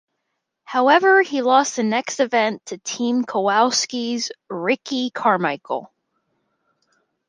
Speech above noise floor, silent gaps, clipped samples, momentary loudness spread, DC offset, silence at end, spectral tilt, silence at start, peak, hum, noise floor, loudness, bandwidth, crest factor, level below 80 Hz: 57 dB; none; under 0.1%; 12 LU; under 0.1%; 1.4 s; -3 dB/octave; 0.7 s; -2 dBFS; none; -77 dBFS; -20 LUFS; 10.5 kHz; 18 dB; -76 dBFS